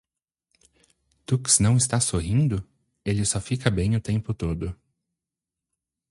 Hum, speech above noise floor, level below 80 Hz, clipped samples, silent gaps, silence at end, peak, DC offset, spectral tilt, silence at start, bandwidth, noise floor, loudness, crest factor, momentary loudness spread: none; 65 dB; -42 dBFS; under 0.1%; none; 1.35 s; -6 dBFS; under 0.1%; -4.5 dB/octave; 1.3 s; 11.5 kHz; -88 dBFS; -24 LUFS; 20 dB; 14 LU